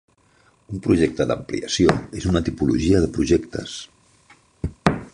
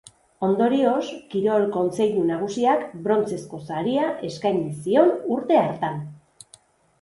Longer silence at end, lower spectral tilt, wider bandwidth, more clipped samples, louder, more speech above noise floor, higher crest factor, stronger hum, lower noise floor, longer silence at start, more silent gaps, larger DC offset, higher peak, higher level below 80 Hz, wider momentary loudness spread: second, 0.05 s vs 0.85 s; about the same, -6 dB/octave vs -6.5 dB/octave; about the same, 11.5 kHz vs 11.5 kHz; neither; about the same, -21 LUFS vs -23 LUFS; first, 38 dB vs 33 dB; about the same, 20 dB vs 18 dB; neither; about the same, -58 dBFS vs -55 dBFS; first, 0.7 s vs 0.4 s; neither; neither; about the same, -2 dBFS vs -4 dBFS; first, -38 dBFS vs -64 dBFS; first, 14 LU vs 9 LU